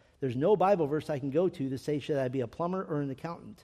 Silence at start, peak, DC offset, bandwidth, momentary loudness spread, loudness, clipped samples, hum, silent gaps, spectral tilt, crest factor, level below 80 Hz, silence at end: 0.2 s; -14 dBFS; under 0.1%; 13 kHz; 10 LU; -31 LUFS; under 0.1%; none; none; -8 dB/octave; 16 dB; -66 dBFS; 0.1 s